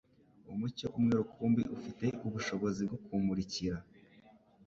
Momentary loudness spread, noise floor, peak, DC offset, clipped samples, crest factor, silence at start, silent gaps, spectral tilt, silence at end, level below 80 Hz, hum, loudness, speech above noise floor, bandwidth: 8 LU; -62 dBFS; -20 dBFS; under 0.1%; under 0.1%; 16 dB; 0.45 s; none; -6.5 dB/octave; 0.85 s; -60 dBFS; none; -36 LUFS; 28 dB; 7.6 kHz